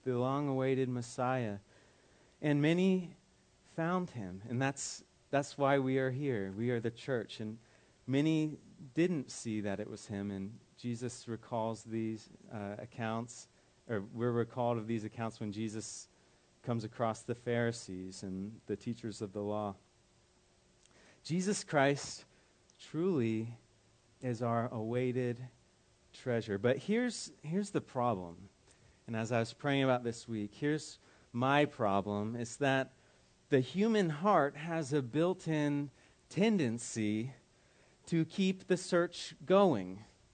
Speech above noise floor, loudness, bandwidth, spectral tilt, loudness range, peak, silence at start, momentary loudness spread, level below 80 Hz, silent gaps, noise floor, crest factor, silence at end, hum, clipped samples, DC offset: 34 dB; -36 LUFS; 9 kHz; -6 dB/octave; 7 LU; -14 dBFS; 0.05 s; 14 LU; -74 dBFS; none; -69 dBFS; 22 dB; 0.3 s; none; under 0.1%; under 0.1%